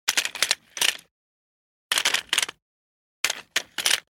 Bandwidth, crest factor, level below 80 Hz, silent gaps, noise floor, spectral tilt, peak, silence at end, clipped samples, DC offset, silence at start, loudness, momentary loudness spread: 17 kHz; 26 dB; -72 dBFS; 1.11-1.90 s, 2.62-3.24 s; under -90 dBFS; 2.5 dB/octave; -2 dBFS; 0.1 s; under 0.1%; under 0.1%; 0.05 s; -24 LUFS; 7 LU